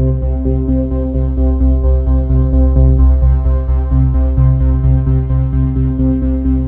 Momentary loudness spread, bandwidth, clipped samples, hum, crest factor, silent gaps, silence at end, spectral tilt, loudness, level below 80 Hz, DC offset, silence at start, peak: 5 LU; 2.1 kHz; under 0.1%; none; 10 dB; none; 0 s; -14 dB/octave; -14 LUFS; -12 dBFS; under 0.1%; 0 s; 0 dBFS